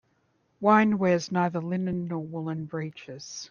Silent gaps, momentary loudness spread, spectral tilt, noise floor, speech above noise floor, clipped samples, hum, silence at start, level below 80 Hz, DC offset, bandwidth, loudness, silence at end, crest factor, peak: none; 17 LU; -6.5 dB/octave; -70 dBFS; 43 dB; under 0.1%; none; 0.6 s; -64 dBFS; under 0.1%; 7.2 kHz; -26 LUFS; 0.05 s; 20 dB; -6 dBFS